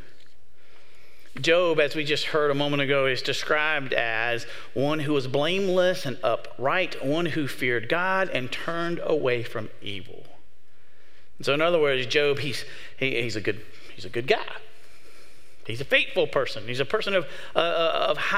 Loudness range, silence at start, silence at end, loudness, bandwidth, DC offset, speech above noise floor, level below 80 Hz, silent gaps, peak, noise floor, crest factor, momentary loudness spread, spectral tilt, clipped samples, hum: 5 LU; 1.35 s; 0 s; -25 LUFS; 16 kHz; 3%; 37 dB; -64 dBFS; none; -2 dBFS; -62 dBFS; 24 dB; 12 LU; -4.5 dB/octave; under 0.1%; none